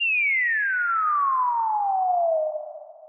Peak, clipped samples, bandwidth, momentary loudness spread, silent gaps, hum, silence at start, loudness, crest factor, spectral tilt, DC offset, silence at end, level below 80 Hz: -16 dBFS; under 0.1%; 3.1 kHz; 8 LU; none; none; 0 s; -22 LUFS; 8 dB; 10.5 dB/octave; under 0.1%; 0 s; under -90 dBFS